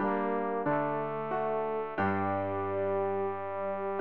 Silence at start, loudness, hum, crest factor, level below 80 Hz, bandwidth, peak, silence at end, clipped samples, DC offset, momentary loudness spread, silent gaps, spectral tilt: 0 s; -32 LUFS; none; 14 dB; -72 dBFS; 4.5 kHz; -16 dBFS; 0 s; under 0.1%; 0.3%; 4 LU; none; -10 dB/octave